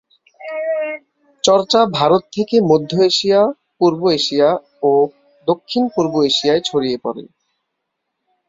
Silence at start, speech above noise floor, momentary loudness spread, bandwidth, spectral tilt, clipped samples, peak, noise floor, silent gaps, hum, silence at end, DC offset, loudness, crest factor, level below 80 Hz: 0.4 s; 60 dB; 11 LU; 7.8 kHz; -4.5 dB/octave; under 0.1%; 0 dBFS; -75 dBFS; none; none; 1.25 s; under 0.1%; -16 LUFS; 16 dB; -60 dBFS